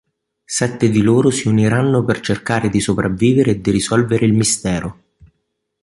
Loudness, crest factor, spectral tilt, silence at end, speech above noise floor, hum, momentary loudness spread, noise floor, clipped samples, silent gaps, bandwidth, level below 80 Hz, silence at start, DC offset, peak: -16 LUFS; 14 dB; -5.5 dB/octave; 0.9 s; 57 dB; none; 6 LU; -72 dBFS; under 0.1%; none; 11.5 kHz; -42 dBFS; 0.5 s; under 0.1%; -2 dBFS